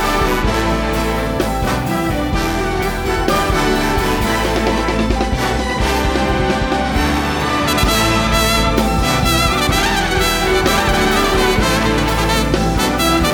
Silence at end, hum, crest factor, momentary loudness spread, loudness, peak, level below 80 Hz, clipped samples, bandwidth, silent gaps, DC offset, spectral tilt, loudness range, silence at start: 0 s; none; 14 dB; 4 LU; -15 LUFS; 0 dBFS; -22 dBFS; under 0.1%; 19 kHz; none; under 0.1%; -4.5 dB/octave; 3 LU; 0 s